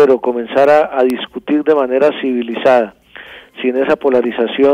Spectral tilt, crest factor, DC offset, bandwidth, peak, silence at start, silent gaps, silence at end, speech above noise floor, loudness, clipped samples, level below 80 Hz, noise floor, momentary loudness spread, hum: -6 dB/octave; 10 dB; under 0.1%; 14 kHz; -2 dBFS; 0 s; none; 0 s; 23 dB; -14 LUFS; under 0.1%; -56 dBFS; -36 dBFS; 11 LU; none